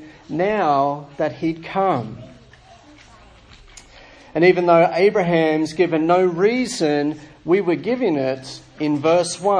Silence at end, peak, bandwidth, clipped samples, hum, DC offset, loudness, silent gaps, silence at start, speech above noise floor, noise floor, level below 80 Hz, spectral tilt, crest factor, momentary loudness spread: 0 s; -2 dBFS; 10.5 kHz; under 0.1%; none; under 0.1%; -19 LUFS; none; 0 s; 29 dB; -47 dBFS; -54 dBFS; -5.5 dB/octave; 18 dB; 11 LU